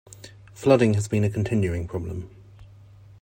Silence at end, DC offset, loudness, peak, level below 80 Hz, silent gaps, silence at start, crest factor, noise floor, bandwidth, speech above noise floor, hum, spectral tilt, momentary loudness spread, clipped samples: 0.55 s; under 0.1%; -23 LUFS; -4 dBFS; -50 dBFS; none; 0.1 s; 22 dB; -48 dBFS; 16 kHz; 26 dB; none; -7 dB/octave; 25 LU; under 0.1%